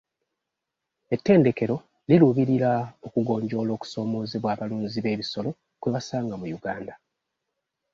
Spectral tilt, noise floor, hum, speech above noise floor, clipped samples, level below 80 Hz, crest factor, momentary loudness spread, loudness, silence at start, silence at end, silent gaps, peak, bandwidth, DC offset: -7.5 dB/octave; -84 dBFS; none; 60 dB; under 0.1%; -62 dBFS; 20 dB; 13 LU; -25 LUFS; 1.1 s; 1 s; none; -6 dBFS; 7.6 kHz; under 0.1%